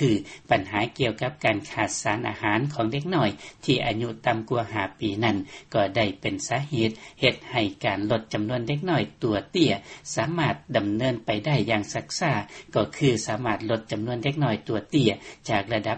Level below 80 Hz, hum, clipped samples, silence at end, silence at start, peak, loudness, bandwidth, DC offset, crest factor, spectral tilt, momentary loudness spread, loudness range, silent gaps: -54 dBFS; none; under 0.1%; 0 s; 0 s; -4 dBFS; -26 LUFS; 8.4 kHz; under 0.1%; 22 dB; -5 dB/octave; 5 LU; 1 LU; none